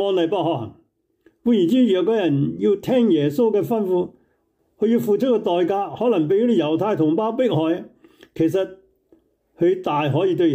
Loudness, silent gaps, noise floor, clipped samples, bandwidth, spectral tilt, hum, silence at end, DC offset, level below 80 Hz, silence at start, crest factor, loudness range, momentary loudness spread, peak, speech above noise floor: -20 LUFS; none; -66 dBFS; under 0.1%; 16 kHz; -8 dB/octave; none; 0 s; under 0.1%; -64 dBFS; 0 s; 12 dB; 3 LU; 7 LU; -8 dBFS; 48 dB